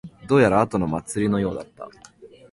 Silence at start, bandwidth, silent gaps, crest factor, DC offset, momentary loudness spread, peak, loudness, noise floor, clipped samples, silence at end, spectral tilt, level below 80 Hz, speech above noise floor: 0.05 s; 11.5 kHz; none; 18 dB; under 0.1%; 23 LU; -4 dBFS; -21 LUFS; -48 dBFS; under 0.1%; 0.25 s; -6.5 dB/octave; -48 dBFS; 27 dB